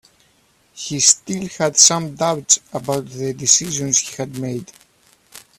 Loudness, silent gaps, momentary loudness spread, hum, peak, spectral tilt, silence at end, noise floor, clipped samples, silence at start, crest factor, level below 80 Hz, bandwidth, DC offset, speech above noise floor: -16 LUFS; none; 16 LU; none; 0 dBFS; -2 dB/octave; 0.2 s; -58 dBFS; under 0.1%; 0.75 s; 20 dB; -58 dBFS; 16 kHz; under 0.1%; 39 dB